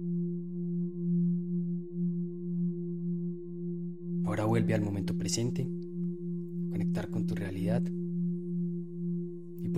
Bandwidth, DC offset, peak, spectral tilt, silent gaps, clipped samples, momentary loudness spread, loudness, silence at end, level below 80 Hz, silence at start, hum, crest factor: 10.5 kHz; 0.4%; -18 dBFS; -7 dB/octave; none; under 0.1%; 8 LU; -33 LUFS; 0 s; -64 dBFS; 0 s; none; 16 dB